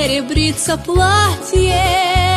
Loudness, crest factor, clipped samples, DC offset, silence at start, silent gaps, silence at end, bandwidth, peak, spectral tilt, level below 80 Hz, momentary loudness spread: -14 LUFS; 12 dB; under 0.1%; under 0.1%; 0 s; none; 0 s; 13.5 kHz; -2 dBFS; -4 dB/octave; -24 dBFS; 4 LU